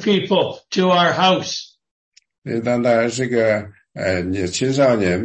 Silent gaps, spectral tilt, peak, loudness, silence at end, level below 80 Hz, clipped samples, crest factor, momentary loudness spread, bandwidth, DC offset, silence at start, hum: 1.91-2.12 s, 2.38-2.42 s; -5 dB/octave; -4 dBFS; -18 LUFS; 0 s; -56 dBFS; under 0.1%; 14 dB; 11 LU; 8.8 kHz; under 0.1%; 0 s; none